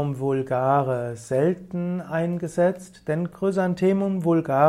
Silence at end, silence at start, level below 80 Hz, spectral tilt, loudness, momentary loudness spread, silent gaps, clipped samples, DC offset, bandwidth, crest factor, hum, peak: 0 s; 0 s; -60 dBFS; -8 dB/octave; -24 LUFS; 7 LU; none; under 0.1%; under 0.1%; 13 kHz; 18 dB; none; -6 dBFS